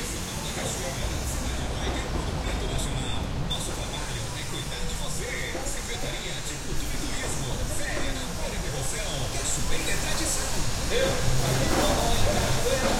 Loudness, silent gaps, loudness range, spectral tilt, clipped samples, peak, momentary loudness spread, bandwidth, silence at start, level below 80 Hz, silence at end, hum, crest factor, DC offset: -29 LUFS; none; 5 LU; -3.5 dB/octave; under 0.1%; -10 dBFS; 7 LU; 16.5 kHz; 0 s; -32 dBFS; 0 s; none; 18 dB; under 0.1%